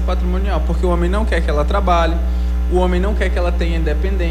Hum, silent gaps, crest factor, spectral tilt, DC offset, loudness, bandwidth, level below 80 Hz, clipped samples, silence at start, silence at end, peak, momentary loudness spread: 60 Hz at -15 dBFS; none; 12 dB; -7.5 dB/octave; under 0.1%; -18 LUFS; 9 kHz; -16 dBFS; under 0.1%; 0 s; 0 s; -4 dBFS; 3 LU